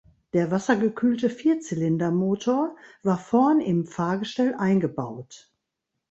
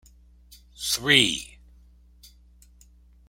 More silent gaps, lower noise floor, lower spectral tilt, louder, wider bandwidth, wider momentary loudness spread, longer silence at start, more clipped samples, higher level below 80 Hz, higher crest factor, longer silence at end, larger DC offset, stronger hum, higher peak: neither; first, -82 dBFS vs -54 dBFS; first, -7 dB/octave vs -2 dB/octave; second, -24 LUFS vs -21 LUFS; second, 8.2 kHz vs 16.5 kHz; second, 8 LU vs 16 LU; second, 0.35 s vs 0.8 s; neither; second, -64 dBFS vs -52 dBFS; second, 18 dB vs 28 dB; second, 0.75 s vs 1.85 s; neither; neither; second, -6 dBFS vs -2 dBFS